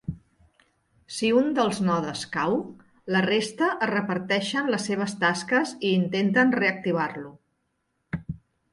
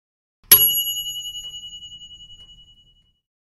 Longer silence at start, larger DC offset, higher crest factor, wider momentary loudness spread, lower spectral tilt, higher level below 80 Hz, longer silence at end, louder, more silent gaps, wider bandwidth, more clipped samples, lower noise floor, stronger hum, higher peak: second, 0.1 s vs 0.5 s; neither; second, 18 dB vs 24 dB; second, 16 LU vs 26 LU; first, -5 dB/octave vs 1.5 dB/octave; about the same, -58 dBFS vs -56 dBFS; second, 0.35 s vs 1.15 s; second, -25 LUFS vs -15 LUFS; neither; second, 11.5 kHz vs 16 kHz; neither; first, -75 dBFS vs -58 dBFS; neither; second, -8 dBFS vs 0 dBFS